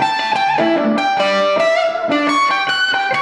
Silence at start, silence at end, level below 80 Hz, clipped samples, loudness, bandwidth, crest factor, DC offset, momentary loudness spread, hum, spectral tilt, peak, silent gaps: 0 s; 0 s; -66 dBFS; under 0.1%; -15 LUFS; 11 kHz; 14 dB; 0.1%; 2 LU; none; -3.5 dB/octave; -2 dBFS; none